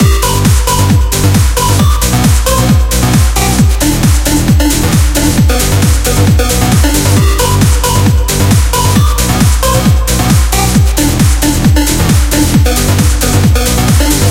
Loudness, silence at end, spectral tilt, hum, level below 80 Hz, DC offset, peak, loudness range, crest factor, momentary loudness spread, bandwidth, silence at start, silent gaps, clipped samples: -9 LUFS; 0 s; -4.5 dB/octave; none; -12 dBFS; under 0.1%; 0 dBFS; 0 LU; 8 dB; 1 LU; 17 kHz; 0 s; none; 0.2%